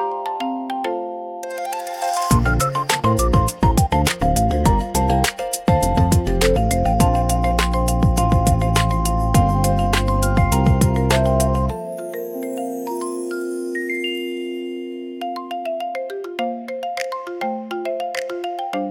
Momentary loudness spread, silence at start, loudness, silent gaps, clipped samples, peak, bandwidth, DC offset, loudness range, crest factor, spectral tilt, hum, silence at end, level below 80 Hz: 11 LU; 0 s; -20 LUFS; none; under 0.1%; -2 dBFS; 17.5 kHz; under 0.1%; 8 LU; 16 dB; -5.5 dB/octave; none; 0 s; -26 dBFS